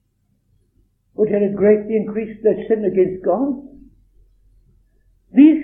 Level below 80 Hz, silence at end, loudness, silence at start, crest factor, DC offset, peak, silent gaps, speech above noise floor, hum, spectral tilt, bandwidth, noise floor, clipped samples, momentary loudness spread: -54 dBFS; 0 s; -18 LUFS; 1.2 s; 18 dB; under 0.1%; 0 dBFS; none; 49 dB; none; -11.5 dB/octave; 3.7 kHz; -65 dBFS; under 0.1%; 10 LU